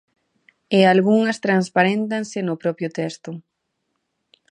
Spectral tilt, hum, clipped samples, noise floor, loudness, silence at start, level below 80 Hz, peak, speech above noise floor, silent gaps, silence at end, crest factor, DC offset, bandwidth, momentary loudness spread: -6 dB/octave; none; under 0.1%; -75 dBFS; -19 LUFS; 0.7 s; -72 dBFS; -2 dBFS; 56 dB; none; 1.1 s; 20 dB; under 0.1%; 10.5 kHz; 14 LU